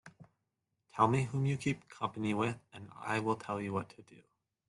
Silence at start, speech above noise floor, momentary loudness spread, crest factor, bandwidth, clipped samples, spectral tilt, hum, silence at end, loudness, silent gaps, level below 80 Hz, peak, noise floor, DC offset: 0.05 s; 50 dB; 17 LU; 22 dB; 11.5 kHz; under 0.1%; -6.5 dB/octave; none; 0.55 s; -35 LUFS; none; -70 dBFS; -14 dBFS; -85 dBFS; under 0.1%